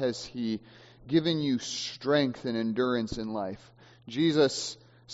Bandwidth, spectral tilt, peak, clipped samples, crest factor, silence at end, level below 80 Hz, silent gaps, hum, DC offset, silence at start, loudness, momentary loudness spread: 8 kHz; -4.5 dB/octave; -12 dBFS; under 0.1%; 18 dB; 0 s; -60 dBFS; none; none; under 0.1%; 0 s; -29 LUFS; 12 LU